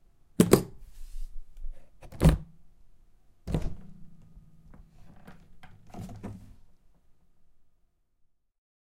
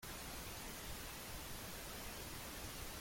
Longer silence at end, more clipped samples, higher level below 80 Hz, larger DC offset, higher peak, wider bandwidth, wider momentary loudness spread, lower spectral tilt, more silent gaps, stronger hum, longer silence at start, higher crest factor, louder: first, 2.45 s vs 0 s; neither; first, -40 dBFS vs -58 dBFS; neither; first, -2 dBFS vs -36 dBFS; about the same, 16 kHz vs 17 kHz; first, 27 LU vs 0 LU; first, -6.5 dB/octave vs -2.5 dB/octave; neither; neither; first, 0.4 s vs 0 s; first, 30 dB vs 14 dB; first, -27 LUFS vs -48 LUFS